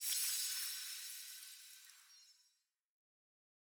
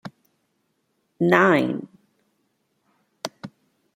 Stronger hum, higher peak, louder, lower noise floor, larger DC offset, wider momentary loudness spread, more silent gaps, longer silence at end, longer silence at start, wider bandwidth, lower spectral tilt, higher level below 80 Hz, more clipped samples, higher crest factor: neither; second, -22 dBFS vs -2 dBFS; second, -41 LUFS vs -20 LUFS; first, -81 dBFS vs -72 dBFS; neither; second, 23 LU vs 26 LU; neither; first, 1.3 s vs 0.5 s; about the same, 0 s vs 0.05 s; first, over 20 kHz vs 15.5 kHz; second, 9.5 dB/octave vs -6 dB/octave; second, under -90 dBFS vs -70 dBFS; neither; about the same, 24 dB vs 24 dB